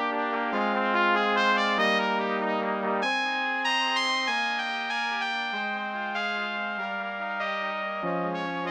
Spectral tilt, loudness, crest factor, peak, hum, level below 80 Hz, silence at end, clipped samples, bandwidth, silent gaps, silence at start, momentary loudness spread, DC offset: -3.5 dB/octave; -26 LUFS; 18 dB; -10 dBFS; none; -82 dBFS; 0 s; under 0.1%; 17 kHz; none; 0 s; 7 LU; under 0.1%